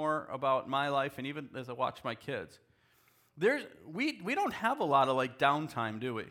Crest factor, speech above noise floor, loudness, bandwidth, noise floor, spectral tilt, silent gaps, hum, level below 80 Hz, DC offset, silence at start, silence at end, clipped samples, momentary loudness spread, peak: 20 dB; 35 dB; -33 LUFS; 17.5 kHz; -68 dBFS; -5.5 dB/octave; none; none; -76 dBFS; under 0.1%; 0 s; 0 s; under 0.1%; 12 LU; -12 dBFS